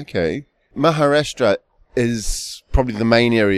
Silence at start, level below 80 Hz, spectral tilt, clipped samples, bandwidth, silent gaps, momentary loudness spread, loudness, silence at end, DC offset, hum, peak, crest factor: 0 s; -30 dBFS; -5 dB/octave; under 0.1%; 15 kHz; none; 12 LU; -19 LUFS; 0 s; under 0.1%; none; 0 dBFS; 18 dB